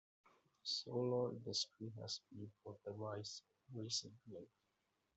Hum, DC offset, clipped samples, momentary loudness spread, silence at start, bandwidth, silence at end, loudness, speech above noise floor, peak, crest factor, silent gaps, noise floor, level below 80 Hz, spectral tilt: none; under 0.1%; under 0.1%; 15 LU; 0.65 s; 8.2 kHz; 0.7 s; -45 LUFS; 39 dB; -30 dBFS; 18 dB; none; -86 dBFS; -86 dBFS; -4.5 dB/octave